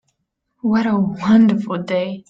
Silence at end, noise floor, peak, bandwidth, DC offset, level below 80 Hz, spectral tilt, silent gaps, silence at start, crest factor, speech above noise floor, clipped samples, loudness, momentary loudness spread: 0.1 s; -72 dBFS; -4 dBFS; 7.2 kHz; under 0.1%; -58 dBFS; -8 dB/octave; none; 0.65 s; 14 dB; 56 dB; under 0.1%; -17 LUFS; 9 LU